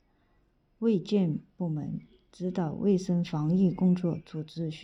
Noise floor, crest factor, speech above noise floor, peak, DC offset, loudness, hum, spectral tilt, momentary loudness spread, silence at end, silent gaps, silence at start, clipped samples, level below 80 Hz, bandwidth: -68 dBFS; 14 dB; 40 dB; -16 dBFS; under 0.1%; -29 LUFS; none; -8.5 dB/octave; 11 LU; 0 s; none; 0.8 s; under 0.1%; -62 dBFS; 7.8 kHz